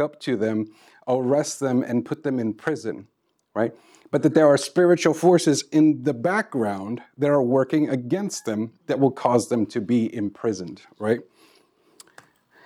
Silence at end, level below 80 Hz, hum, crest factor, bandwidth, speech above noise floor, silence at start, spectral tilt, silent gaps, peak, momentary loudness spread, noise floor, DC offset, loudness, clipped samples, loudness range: 1.45 s; -76 dBFS; none; 18 dB; 13.5 kHz; 37 dB; 0 s; -6 dB/octave; none; -4 dBFS; 11 LU; -59 dBFS; under 0.1%; -22 LUFS; under 0.1%; 6 LU